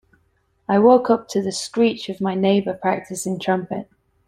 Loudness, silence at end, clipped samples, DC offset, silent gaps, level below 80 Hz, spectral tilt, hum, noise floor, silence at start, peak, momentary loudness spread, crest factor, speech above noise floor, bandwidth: -20 LUFS; 0.45 s; under 0.1%; under 0.1%; none; -62 dBFS; -5.5 dB/octave; none; -64 dBFS; 0.7 s; -2 dBFS; 12 LU; 20 dB; 45 dB; 15 kHz